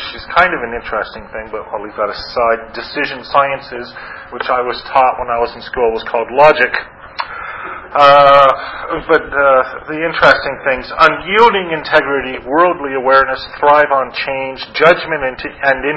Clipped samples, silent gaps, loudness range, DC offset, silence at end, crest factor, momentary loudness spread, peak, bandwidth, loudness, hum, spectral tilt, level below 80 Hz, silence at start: 0.3%; none; 7 LU; under 0.1%; 0 s; 14 dB; 15 LU; 0 dBFS; 8 kHz; -13 LUFS; none; -5.5 dB/octave; -42 dBFS; 0 s